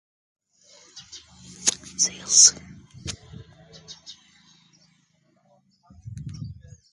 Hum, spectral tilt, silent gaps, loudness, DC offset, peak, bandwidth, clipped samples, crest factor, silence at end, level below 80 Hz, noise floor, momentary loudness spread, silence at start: none; 0 dB/octave; none; -18 LUFS; under 0.1%; -2 dBFS; 11.5 kHz; under 0.1%; 28 dB; 0.4 s; -56 dBFS; -65 dBFS; 30 LU; 0.95 s